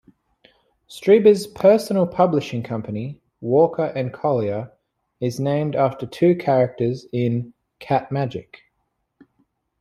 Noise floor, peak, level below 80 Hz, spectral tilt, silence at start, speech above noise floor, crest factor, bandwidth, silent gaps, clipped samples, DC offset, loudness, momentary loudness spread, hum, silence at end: -73 dBFS; -2 dBFS; -60 dBFS; -7.5 dB/octave; 0.9 s; 54 dB; 18 dB; 14.5 kHz; none; under 0.1%; under 0.1%; -20 LUFS; 14 LU; none; 1.4 s